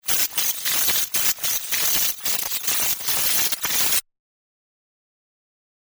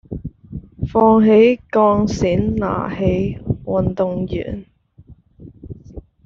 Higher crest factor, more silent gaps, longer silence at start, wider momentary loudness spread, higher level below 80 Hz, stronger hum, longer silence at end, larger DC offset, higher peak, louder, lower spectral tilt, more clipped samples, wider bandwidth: about the same, 20 dB vs 16 dB; neither; about the same, 0.05 s vs 0.1 s; second, 4 LU vs 23 LU; second, -56 dBFS vs -38 dBFS; neither; first, 2 s vs 0.25 s; neither; about the same, -4 dBFS vs -2 dBFS; about the same, -19 LUFS vs -17 LUFS; second, 1.5 dB/octave vs -7 dB/octave; neither; first, over 20 kHz vs 7.4 kHz